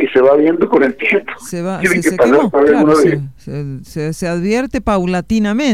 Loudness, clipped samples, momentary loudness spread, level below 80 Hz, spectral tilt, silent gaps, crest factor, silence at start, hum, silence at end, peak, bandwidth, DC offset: -13 LUFS; under 0.1%; 14 LU; -40 dBFS; -6 dB/octave; none; 14 dB; 0 s; none; 0 s; 0 dBFS; 15.5 kHz; 0.8%